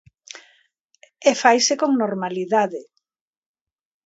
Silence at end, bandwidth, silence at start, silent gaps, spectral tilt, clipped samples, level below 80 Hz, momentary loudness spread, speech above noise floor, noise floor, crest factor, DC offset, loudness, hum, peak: 1.25 s; 8 kHz; 0.35 s; 0.85-0.89 s; -3 dB/octave; under 0.1%; -74 dBFS; 24 LU; 44 dB; -63 dBFS; 22 dB; under 0.1%; -19 LUFS; none; 0 dBFS